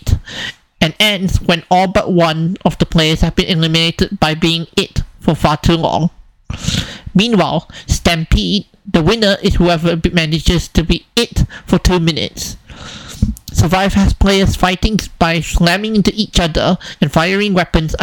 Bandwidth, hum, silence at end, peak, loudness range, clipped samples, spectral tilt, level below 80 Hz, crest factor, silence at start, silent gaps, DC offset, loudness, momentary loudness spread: 18.5 kHz; none; 0 s; 0 dBFS; 3 LU; under 0.1%; -5 dB/octave; -24 dBFS; 14 dB; 0.05 s; none; under 0.1%; -14 LUFS; 8 LU